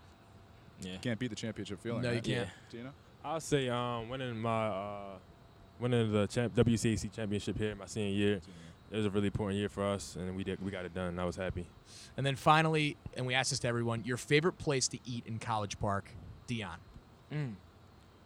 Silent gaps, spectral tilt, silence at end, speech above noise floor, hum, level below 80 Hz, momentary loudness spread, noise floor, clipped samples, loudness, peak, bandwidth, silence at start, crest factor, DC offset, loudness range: none; -5 dB/octave; 0.55 s; 24 dB; none; -58 dBFS; 16 LU; -59 dBFS; under 0.1%; -35 LUFS; -12 dBFS; 15.5 kHz; 0 s; 22 dB; under 0.1%; 6 LU